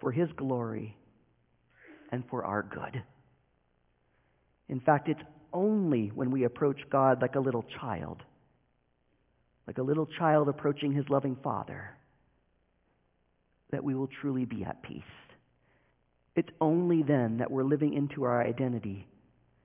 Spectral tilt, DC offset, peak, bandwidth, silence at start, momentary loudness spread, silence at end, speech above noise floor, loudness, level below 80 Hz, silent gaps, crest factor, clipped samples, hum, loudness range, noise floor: -7 dB/octave; under 0.1%; -10 dBFS; 3.8 kHz; 0 s; 15 LU; 0.6 s; 43 dB; -31 LUFS; -66 dBFS; none; 22 dB; under 0.1%; none; 9 LU; -73 dBFS